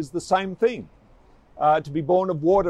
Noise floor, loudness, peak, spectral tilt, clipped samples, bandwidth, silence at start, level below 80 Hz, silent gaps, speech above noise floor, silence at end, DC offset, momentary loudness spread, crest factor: -53 dBFS; -22 LUFS; -8 dBFS; -6.5 dB/octave; under 0.1%; 11.5 kHz; 0 s; -52 dBFS; none; 32 dB; 0 s; under 0.1%; 4 LU; 14 dB